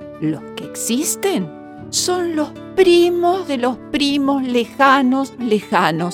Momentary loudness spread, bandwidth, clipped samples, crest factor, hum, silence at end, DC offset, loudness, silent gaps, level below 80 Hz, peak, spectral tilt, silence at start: 11 LU; 18 kHz; under 0.1%; 18 dB; none; 0 s; under 0.1%; -17 LUFS; none; -54 dBFS; 0 dBFS; -3.5 dB/octave; 0 s